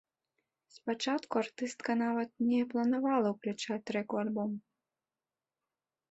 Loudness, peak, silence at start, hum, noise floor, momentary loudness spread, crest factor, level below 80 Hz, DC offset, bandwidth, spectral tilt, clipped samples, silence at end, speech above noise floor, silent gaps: -34 LUFS; -18 dBFS; 0.75 s; none; under -90 dBFS; 7 LU; 18 dB; -80 dBFS; under 0.1%; 8.2 kHz; -5 dB/octave; under 0.1%; 1.5 s; over 57 dB; none